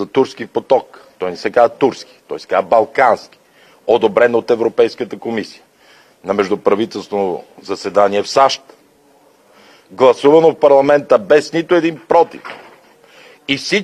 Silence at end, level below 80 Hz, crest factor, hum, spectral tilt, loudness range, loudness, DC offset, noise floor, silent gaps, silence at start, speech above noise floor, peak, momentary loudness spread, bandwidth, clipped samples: 0 s; -60 dBFS; 16 dB; none; -5 dB/octave; 6 LU; -14 LUFS; under 0.1%; -50 dBFS; none; 0 s; 36 dB; 0 dBFS; 15 LU; 11.5 kHz; under 0.1%